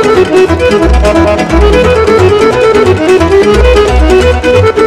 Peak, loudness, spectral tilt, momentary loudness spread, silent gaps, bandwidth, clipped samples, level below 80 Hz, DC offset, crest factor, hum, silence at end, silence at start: 0 dBFS; -6 LUFS; -6 dB/octave; 2 LU; none; 13 kHz; 9%; -14 dBFS; under 0.1%; 6 dB; none; 0 s; 0 s